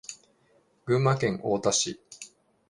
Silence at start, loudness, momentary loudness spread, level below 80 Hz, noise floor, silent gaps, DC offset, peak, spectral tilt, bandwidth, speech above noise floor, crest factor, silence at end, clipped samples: 0.1 s; -26 LUFS; 20 LU; -62 dBFS; -65 dBFS; none; under 0.1%; -10 dBFS; -4 dB/octave; 11.5 kHz; 40 dB; 20 dB; 0.45 s; under 0.1%